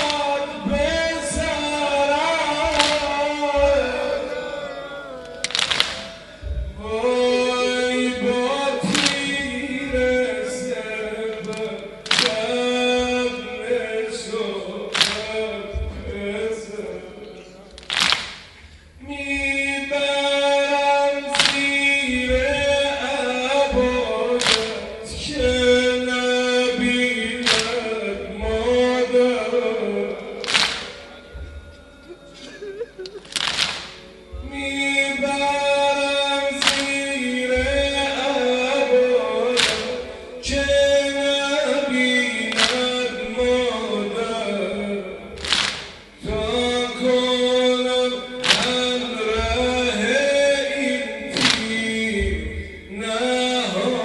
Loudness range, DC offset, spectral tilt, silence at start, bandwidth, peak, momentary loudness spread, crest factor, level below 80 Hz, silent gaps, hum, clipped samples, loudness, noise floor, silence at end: 6 LU; under 0.1%; -3 dB/octave; 0 s; 11.5 kHz; 0 dBFS; 13 LU; 22 dB; -40 dBFS; none; none; under 0.1%; -20 LUFS; -45 dBFS; 0 s